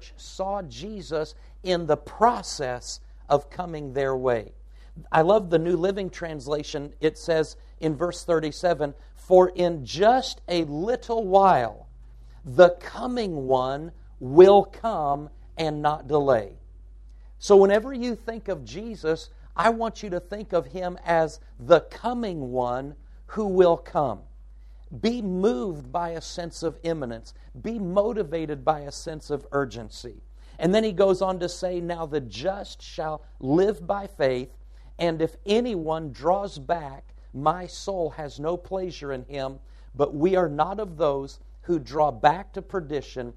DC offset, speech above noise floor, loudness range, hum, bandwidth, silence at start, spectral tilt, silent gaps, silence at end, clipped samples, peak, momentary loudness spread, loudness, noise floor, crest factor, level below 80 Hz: under 0.1%; 21 dB; 7 LU; none; 11.5 kHz; 0 s; -6 dB/octave; none; 0 s; under 0.1%; -2 dBFS; 14 LU; -25 LUFS; -45 dBFS; 24 dB; -46 dBFS